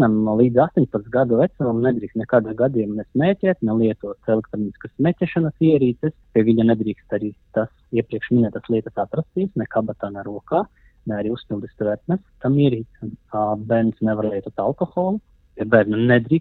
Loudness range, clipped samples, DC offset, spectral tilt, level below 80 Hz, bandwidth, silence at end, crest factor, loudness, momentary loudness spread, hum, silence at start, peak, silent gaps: 4 LU; under 0.1%; under 0.1%; -11 dB/octave; -52 dBFS; 4.2 kHz; 0 s; 20 dB; -21 LUFS; 11 LU; none; 0 s; 0 dBFS; none